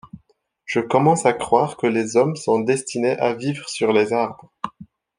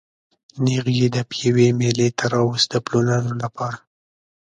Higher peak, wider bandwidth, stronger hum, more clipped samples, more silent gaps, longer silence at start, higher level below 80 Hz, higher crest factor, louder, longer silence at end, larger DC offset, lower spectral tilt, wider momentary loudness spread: about the same, -2 dBFS vs -2 dBFS; first, 10.5 kHz vs 9.4 kHz; neither; neither; neither; second, 0.15 s vs 0.55 s; second, -62 dBFS vs -56 dBFS; about the same, 18 dB vs 18 dB; about the same, -20 LUFS vs -20 LUFS; second, 0.35 s vs 0.65 s; neither; about the same, -5.5 dB/octave vs -5.5 dB/octave; first, 14 LU vs 10 LU